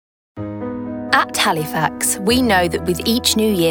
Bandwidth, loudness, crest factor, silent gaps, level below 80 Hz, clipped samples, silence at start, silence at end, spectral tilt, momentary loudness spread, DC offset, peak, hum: 19.5 kHz; -17 LUFS; 18 dB; none; -42 dBFS; under 0.1%; 0.35 s; 0 s; -3.5 dB/octave; 12 LU; under 0.1%; 0 dBFS; none